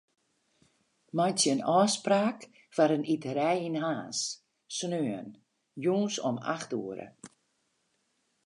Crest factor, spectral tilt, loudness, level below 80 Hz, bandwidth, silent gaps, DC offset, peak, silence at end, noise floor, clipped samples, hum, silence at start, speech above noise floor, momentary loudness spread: 20 dB; -4 dB/octave; -30 LUFS; -82 dBFS; 11.5 kHz; none; under 0.1%; -12 dBFS; 1.2 s; -76 dBFS; under 0.1%; none; 1.15 s; 46 dB; 16 LU